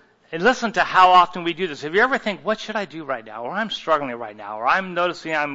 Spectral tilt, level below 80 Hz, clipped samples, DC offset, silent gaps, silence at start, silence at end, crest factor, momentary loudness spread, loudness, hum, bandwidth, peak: -4 dB/octave; -58 dBFS; under 0.1%; under 0.1%; none; 0.3 s; 0 s; 20 dB; 15 LU; -20 LUFS; none; 8 kHz; -2 dBFS